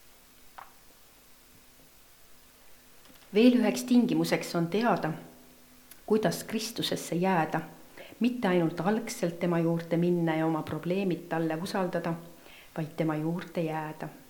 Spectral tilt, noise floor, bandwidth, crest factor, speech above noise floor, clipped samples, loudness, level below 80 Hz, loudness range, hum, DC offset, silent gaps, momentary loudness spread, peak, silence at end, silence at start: -6 dB/octave; -57 dBFS; 19 kHz; 20 dB; 28 dB; under 0.1%; -29 LUFS; -66 dBFS; 4 LU; none; under 0.1%; none; 16 LU; -10 dBFS; 0.1 s; 0.45 s